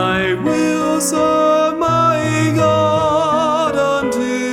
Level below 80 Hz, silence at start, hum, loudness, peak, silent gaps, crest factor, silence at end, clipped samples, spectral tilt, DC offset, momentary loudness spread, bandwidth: -46 dBFS; 0 s; none; -15 LUFS; -2 dBFS; none; 12 dB; 0 s; under 0.1%; -5 dB/octave; under 0.1%; 3 LU; 17 kHz